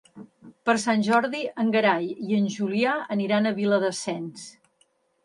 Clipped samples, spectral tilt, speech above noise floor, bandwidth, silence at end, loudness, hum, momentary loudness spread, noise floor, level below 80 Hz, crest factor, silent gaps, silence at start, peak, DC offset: under 0.1%; -5 dB/octave; 43 dB; 11.5 kHz; 0.75 s; -24 LUFS; none; 10 LU; -67 dBFS; -74 dBFS; 16 dB; none; 0.15 s; -8 dBFS; under 0.1%